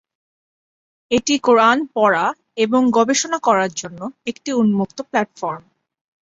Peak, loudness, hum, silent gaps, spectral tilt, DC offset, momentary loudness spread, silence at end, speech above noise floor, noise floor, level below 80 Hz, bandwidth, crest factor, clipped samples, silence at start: -2 dBFS; -18 LUFS; none; none; -4 dB/octave; under 0.1%; 14 LU; 0.6 s; over 73 dB; under -90 dBFS; -60 dBFS; 7.8 kHz; 16 dB; under 0.1%; 1.1 s